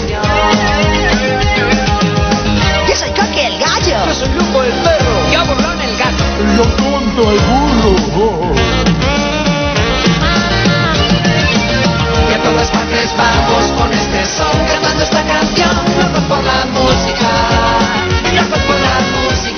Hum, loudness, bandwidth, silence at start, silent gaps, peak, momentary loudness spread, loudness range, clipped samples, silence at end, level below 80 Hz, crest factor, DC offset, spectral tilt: none; -12 LUFS; 6.6 kHz; 0 s; none; 0 dBFS; 2 LU; 1 LU; under 0.1%; 0 s; -22 dBFS; 12 dB; 0.1%; -4.5 dB/octave